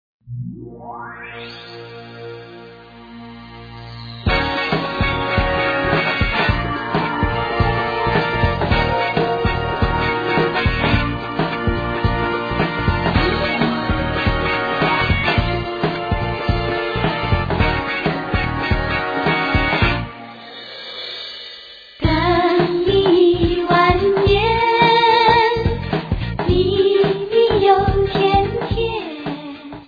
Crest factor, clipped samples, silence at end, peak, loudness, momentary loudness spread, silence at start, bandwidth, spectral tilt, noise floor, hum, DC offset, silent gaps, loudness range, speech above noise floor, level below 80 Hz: 18 dB; under 0.1%; 0.05 s; 0 dBFS; -18 LUFS; 18 LU; 0.25 s; 5 kHz; -8 dB/octave; -39 dBFS; none; under 0.1%; none; 7 LU; 6 dB; -30 dBFS